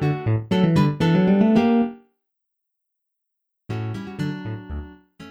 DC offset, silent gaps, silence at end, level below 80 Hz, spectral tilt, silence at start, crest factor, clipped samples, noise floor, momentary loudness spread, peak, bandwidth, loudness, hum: under 0.1%; none; 0 s; -46 dBFS; -8.5 dB/octave; 0 s; 16 dB; under 0.1%; -79 dBFS; 16 LU; -6 dBFS; 9 kHz; -20 LUFS; none